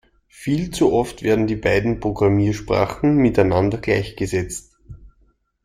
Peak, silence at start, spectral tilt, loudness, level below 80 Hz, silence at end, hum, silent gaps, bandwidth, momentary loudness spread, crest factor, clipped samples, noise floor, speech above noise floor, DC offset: -2 dBFS; 0.4 s; -6.5 dB/octave; -19 LUFS; -40 dBFS; 0.55 s; none; none; 15 kHz; 7 LU; 16 dB; under 0.1%; -60 dBFS; 42 dB; under 0.1%